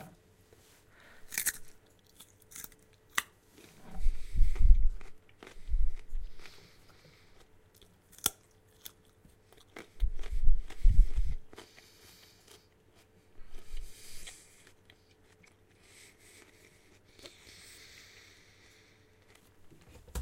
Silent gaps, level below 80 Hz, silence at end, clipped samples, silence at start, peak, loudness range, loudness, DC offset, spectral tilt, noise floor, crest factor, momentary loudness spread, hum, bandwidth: none; -34 dBFS; 0 s; under 0.1%; 1.25 s; -6 dBFS; 19 LU; -36 LUFS; under 0.1%; -3 dB/octave; -64 dBFS; 24 dB; 27 LU; none; 16.5 kHz